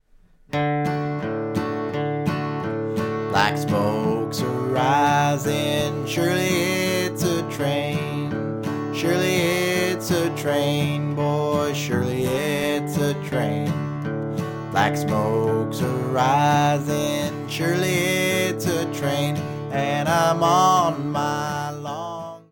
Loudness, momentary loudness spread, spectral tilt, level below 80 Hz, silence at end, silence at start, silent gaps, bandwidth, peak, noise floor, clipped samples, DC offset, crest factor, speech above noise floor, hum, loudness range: -22 LUFS; 8 LU; -5 dB/octave; -56 dBFS; 0.1 s; 0.5 s; none; 17.5 kHz; -2 dBFS; -53 dBFS; under 0.1%; under 0.1%; 20 dB; 33 dB; none; 3 LU